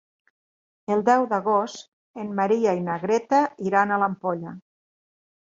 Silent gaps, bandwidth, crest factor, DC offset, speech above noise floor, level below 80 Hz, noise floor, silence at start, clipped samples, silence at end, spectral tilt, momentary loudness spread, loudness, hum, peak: 1.88-2.14 s; 7.8 kHz; 18 dB; under 0.1%; over 67 dB; -70 dBFS; under -90 dBFS; 0.9 s; under 0.1%; 0.95 s; -6 dB/octave; 16 LU; -23 LUFS; none; -6 dBFS